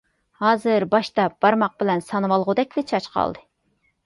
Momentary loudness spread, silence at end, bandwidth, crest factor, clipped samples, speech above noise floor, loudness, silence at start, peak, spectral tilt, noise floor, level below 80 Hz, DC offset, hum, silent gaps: 6 LU; 0.65 s; 11.5 kHz; 18 dB; under 0.1%; 47 dB; -21 LUFS; 0.4 s; -4 dBFS; -6.5 dB/octave; -68 dBFS; -60 dBFS; under 0.1%; none; none